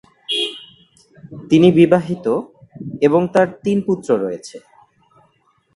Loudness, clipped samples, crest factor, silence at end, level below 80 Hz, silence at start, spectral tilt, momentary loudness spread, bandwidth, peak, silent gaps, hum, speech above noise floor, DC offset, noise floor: -16 LUFS; under 0.1%; 18 dB; 1.15 s; -54 dBFS; 0.3 s; -6.5 dB/octave; 24 LU; 11.5 kHz; 0 dBFS; none; none; 45 dB; under 0.1%; -60 dBFS